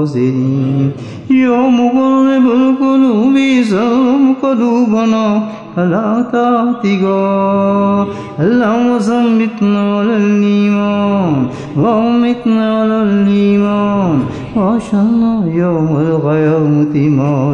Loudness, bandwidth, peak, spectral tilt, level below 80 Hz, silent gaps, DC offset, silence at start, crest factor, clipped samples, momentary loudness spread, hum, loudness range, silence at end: -12 LUFS; 8.6 kHz; -2 dBFS; -8 dB/octave; -48 dBFS; none; 0.1%; 0 s; 10 dB; under 0.1%; 4 LU; none; 2 LU; 0 s